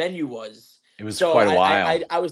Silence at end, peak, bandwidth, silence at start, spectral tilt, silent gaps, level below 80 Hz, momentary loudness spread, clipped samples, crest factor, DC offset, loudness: 0 s; -4 dBFS; 15.5 kHz; 0 s; -4.5 dB/octave; none; -64 dBFS; 20 LU; under 0.1%; 18 dB; under 0.1%; -20 LUFS